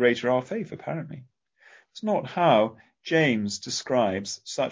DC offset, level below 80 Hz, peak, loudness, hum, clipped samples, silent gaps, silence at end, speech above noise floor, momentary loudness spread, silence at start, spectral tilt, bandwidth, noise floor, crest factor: under 0.1%; -64 dBFS; -6 dBFS; -26 LUFS; none; under 0.1%; none; 0 s; 31 dB; 14 LU; 0 s; -4.5 dB/octave; 7.8 kHz; -57 dBFS; 18 dB